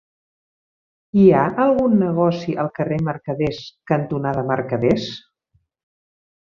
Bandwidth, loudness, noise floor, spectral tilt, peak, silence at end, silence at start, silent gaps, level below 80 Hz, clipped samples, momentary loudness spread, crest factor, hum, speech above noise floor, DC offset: 7 kHz; -19 LUFS; -66 dBFS; -8.5 dB/octave; -2 dBFS; 1.3 s; 1.15 s; none; -52 dBFS; under 0.1%; 10 LU; 18 dB; none; 47 dB; under 0.1%